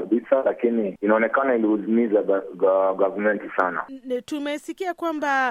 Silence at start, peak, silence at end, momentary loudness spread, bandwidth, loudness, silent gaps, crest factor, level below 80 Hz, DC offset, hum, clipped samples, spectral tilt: 0 s; -4 dBFS; 0 s; 9 LU; 13 kHz; -23 LUFS; none; 18 dB; -72 dBFS; under 0.1%; none; under 0.1%; -6 dB/octave